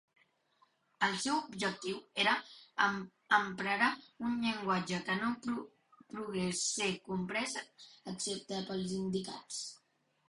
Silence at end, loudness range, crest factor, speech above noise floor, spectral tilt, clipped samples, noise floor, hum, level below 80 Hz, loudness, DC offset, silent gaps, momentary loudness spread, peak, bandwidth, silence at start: 0.5 s; 4 LU; 24 dB; 41 dB; -3 dB/octave; under 0.1%; -77 dBFS; none; -72 dBFS; -35 LUFS; under 0.1%; none; 12 LU; -12 dBFS; 11.5 kHz; 1 s